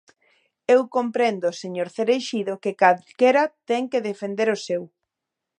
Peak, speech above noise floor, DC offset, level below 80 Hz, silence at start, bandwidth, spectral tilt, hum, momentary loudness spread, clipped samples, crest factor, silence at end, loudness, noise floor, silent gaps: -2 dBFS; 63 dB; under 0.1%; -78 dBFS; 0.7 s; 10 kHz; -4.5 dB/octave; none; 10 LU; under 0.1%; 22 dB; 0.75 s; -22 LUFS; -84 dBFS; none